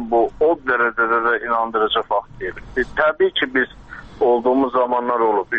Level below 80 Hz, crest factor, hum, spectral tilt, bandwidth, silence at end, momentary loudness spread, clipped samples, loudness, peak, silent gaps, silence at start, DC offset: -46 dBFS; 16 dB; none; -6 dB/octave; 6.6 kHz; 0 s; 8 LU; under 0.1%; -18 LUFS; -2 dBFS; none; 0 s; under 0.1%